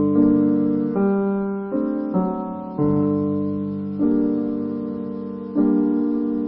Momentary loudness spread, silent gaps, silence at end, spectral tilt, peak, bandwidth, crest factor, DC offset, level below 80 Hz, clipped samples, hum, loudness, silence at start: 9 LU; none; 0 s; -14.5 dB/octave; -6 dBFS; 2.9 kHz; 16 dB; under 0.1%; -52 dBFS; under 0.1%; none; -22 LUFS; 0 s